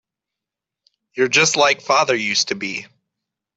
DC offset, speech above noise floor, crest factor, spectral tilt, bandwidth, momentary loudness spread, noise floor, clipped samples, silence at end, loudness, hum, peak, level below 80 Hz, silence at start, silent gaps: under 0.1%; 68 dB; 20 dB; -1.5 dB/octave; 8.4 kHz; 13 LU; -86 dBFS; under 0.1%; 0.75 s; -17 LUFS; none; -2 dBFS; -70 dBFS; 1.15 s; none